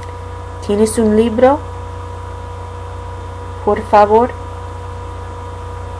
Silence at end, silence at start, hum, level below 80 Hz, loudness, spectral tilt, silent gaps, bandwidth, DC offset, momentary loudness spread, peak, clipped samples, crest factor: 0 s; 0 s; none; -34 dBFS; -13 LUFS; -6.5 dB/octave; none; 11 kHz; under 0.1%; 17 LU; 0 dBFS; under 0.1%; 16 dB